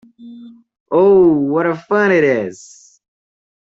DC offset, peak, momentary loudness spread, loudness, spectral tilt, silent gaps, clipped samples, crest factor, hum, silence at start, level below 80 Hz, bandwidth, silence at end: under 0.1%; -2 dBFS; 9 LU; -14 LUFS; -7 dB/octave; 0.80-0.86 s; under 0.1%; 14 dB; none; 0.2 s; -56 dBFS; 8 kHz; 1.1 s